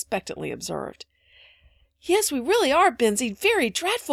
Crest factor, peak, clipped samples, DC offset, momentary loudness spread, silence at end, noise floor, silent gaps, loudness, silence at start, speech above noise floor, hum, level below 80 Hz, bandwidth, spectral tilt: 18 dB; -6 dBFS; under 0.1%; under 0.1%; 14 LU; 0 s; -59 dBFS; none; -23 LUFS; 0 s; 36 dB; none; -58 dBFS; 16.5 kHz; -2.5 dB/octave